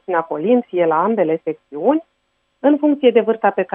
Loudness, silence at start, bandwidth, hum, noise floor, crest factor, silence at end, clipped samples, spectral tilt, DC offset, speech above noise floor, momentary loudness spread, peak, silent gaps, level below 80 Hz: -17 LUFS; 0.1 s; 3.6 kHz; none; -67 dBFS; 16 dB; 0.1 s; under 0.1%; -9.5 dB/octave; under 0.1%; 51 dB; 7 LU; 0 dBFS; none; -74 dBFS